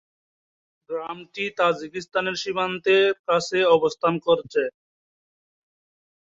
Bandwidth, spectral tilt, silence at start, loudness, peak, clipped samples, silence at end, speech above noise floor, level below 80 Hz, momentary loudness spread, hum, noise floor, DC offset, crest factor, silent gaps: 7.8 kHz; -4.5 dB/octave; 0.9 s; -23 LUFS; -6 dBFS; under 0.1%; 1.6 s; over 67 dB; -68 dBFS; 13 LU; none; under -90 dBFS; under 0.1%; 18 dB; 3.19-3.24 s